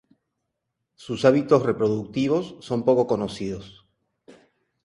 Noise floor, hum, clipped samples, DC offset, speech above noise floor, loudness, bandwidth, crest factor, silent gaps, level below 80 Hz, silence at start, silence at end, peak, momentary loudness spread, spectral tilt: -80 dBFS; none; under 0.1%; under 0.1%; 57 dB; -23 LUFS; 11 kHz; 20 dB; none; -58 dBFS; 1 s; 0.55 s; -4 dBFS; 12 LU; -7 dB/octave